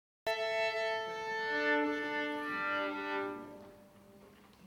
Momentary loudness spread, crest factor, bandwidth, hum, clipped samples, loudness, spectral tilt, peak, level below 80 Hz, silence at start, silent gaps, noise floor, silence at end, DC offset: 9 LU; 18 dB; 18 kHz; none; under 0.1%; -35 LUFS; -3.5 dB/octave; -20 dBFS; -76 dBFS; 0.25 s; none; -59 dBFS; 0 s; under 0.1%